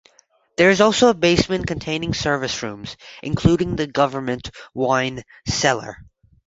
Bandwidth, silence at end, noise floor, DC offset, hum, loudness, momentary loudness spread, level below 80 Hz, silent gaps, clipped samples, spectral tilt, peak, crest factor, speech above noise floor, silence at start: 8 kHz; 0.45 s; -59 dBFS; under 0.1%; none; -19 LUFS; 17 LU; -42 dBFS; none; under 0.1%; -4.5 dB/octave; -2 dBFS; 18 dB; 39 dB; 0.6 s